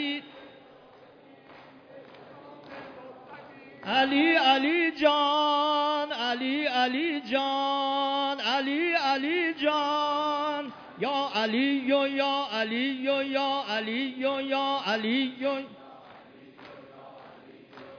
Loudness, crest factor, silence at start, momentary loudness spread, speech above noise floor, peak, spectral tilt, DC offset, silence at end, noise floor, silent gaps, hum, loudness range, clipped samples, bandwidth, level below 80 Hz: -26 LUFS; 18 dB; 0 s; 21 LU; 27 dB; -10 dBFS; -4 dB/octave; under 0.1%; 0 s; -53 dBFS; none; none; 7 LU; under 0.1%; 5.4 kHz; -76 dBFS